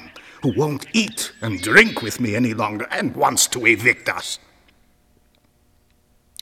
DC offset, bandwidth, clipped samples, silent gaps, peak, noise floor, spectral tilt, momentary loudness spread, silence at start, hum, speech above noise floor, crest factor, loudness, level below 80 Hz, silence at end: under 0.1%; 16 kHz; under 0.1%; none; 0 dBFS; -59 dBFS; -3 dB/octave; 13 LU; 0 s; none; 40 dB; 22 dB; -18 LUFS; -54 dBFS; 2.05 s